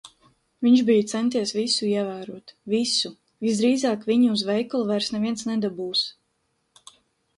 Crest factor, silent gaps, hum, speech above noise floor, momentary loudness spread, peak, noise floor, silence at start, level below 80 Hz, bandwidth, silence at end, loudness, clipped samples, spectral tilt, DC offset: 16 dB; none; none; 50 dB; 10 LU; -8 dBFS; -72 dBFS; 0.05 s; -68 dBFS; 11.5 kHz; 1.25 s; -23 LUFS; under 0.1%; -4 dB/octave; under 0.1%